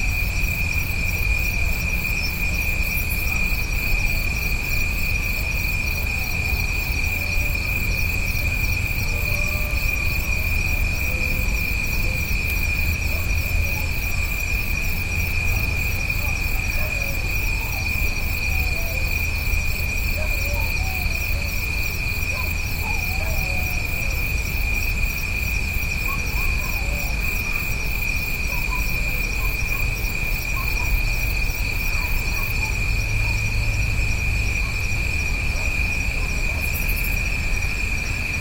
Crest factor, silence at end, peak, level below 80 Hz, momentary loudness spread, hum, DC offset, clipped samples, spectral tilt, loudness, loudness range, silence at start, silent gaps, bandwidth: 14 dB; 0 s; -8 dBFS; -26 dBFS; 2 LU; none; under 0.1%; under 0.1%; -3.5 dB/octave; -23 LUFS; 1 LU; 0 s; none; 17 kHz